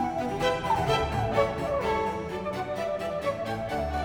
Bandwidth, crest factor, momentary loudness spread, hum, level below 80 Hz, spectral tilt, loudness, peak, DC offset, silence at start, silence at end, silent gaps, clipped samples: 19.5 kHz; 16 dB; 6 LU; none; -44 dBFS; -5.5 dB/octave; -28 LUFS; -12 dBFS; under 0.1%; 0 s; 0 s; none; under 0.1%